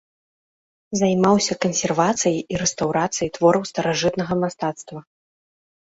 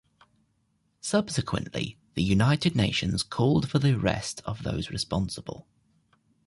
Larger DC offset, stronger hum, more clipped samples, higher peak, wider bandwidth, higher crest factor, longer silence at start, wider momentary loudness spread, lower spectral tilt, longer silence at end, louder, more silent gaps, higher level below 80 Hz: neither; neither; neither; first, -4 dBFS vs -10 dBFS; second, 8 kHz vs 11.5 kHz; about the same, 18 dB vs 18 dB; second, 0.9 s vs 1.05 s; about the same, 10 LU vs 10 LU; about the same, -4.5 dB/octave vs -5.5 dB/octave; about the same, 0.9 s vs 0.85 s; first, -21 LUFS vs -27 LUFS; neither; second, -54 dBFS vs -48 dBFS